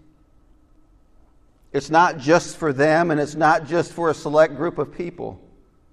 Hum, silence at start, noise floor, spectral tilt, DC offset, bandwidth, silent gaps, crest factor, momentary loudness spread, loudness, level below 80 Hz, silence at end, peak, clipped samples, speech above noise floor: none; 1.75 s; -54 dBFS; -5.5 dB/octave; under 0.1%; 12 kHz; none; 18 dB; 12 LU; -20 LUFS; -54 dBFS; 0.55 s; -2 dBFS; under 0.1%; 35 dB